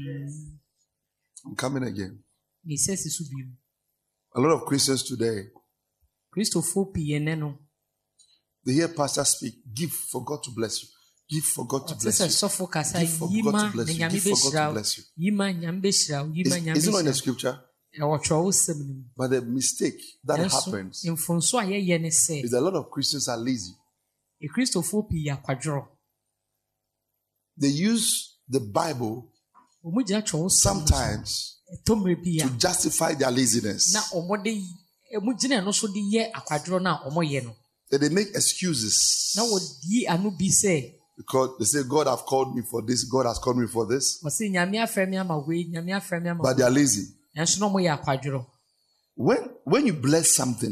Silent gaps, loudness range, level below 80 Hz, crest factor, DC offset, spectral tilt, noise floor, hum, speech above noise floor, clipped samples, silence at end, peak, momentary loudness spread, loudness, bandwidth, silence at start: none; 5 LU; -48 dBFS; 18 dB; under 0.1%; -3.5 dB/octave; -81 dBFS; 50 Hz at -55 dBFS; 56 dB; under 0.1%; 0 s; -8 dBFS; 11 LU; -24 LUFS; 14 kHz; 0 s